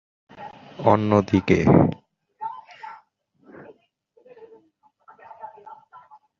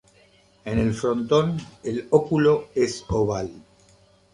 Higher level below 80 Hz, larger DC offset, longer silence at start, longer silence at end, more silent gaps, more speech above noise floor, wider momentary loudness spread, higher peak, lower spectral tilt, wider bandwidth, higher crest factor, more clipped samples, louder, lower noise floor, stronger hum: about the same, -46 dBFS vs -46 dBFS; neither; second, 0.4 s vs 0.65 s; about the same, 0.65 s vs 0.75 s; neither; first, 45 dB vs 35 dB; first, 25 LU vs 11 LU; about the same, -2 dBFS vs -4 dBFS; first, -8.5 dB/octave vs -6.5 dB/octave; second, 7.2 kHz vs 11 kHz; about the same, 22 dB vs 20 dB; neither; first, -19 LUFS vs -23 LUFS; first, -62 dBFS vs -57 dBFS; neither